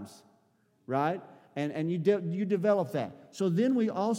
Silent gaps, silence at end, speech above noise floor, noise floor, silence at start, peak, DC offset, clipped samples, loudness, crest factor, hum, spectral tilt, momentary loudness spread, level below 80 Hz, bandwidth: none; 0 s; 40 dB; -69 dBFS; 0 s; -14 dBFS; under 0.1%; under 0.1%; -30 LUFS; 18 dB; none; -7.5 dB/octave; 12 LU; -84 dBFS; 16 kHz